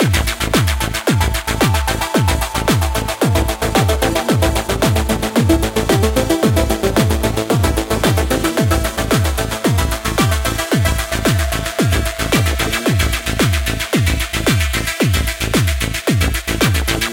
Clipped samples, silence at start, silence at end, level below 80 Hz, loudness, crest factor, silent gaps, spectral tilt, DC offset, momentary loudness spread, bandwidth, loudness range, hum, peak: under 0.1%; 0 s; 0 s; -22 dBFS; -16 LUFS; 16 dB; none; -4.5 dB/octave; under 0.1%; 2 LU; 17 kHz; 1 LU; none; 0 dBFS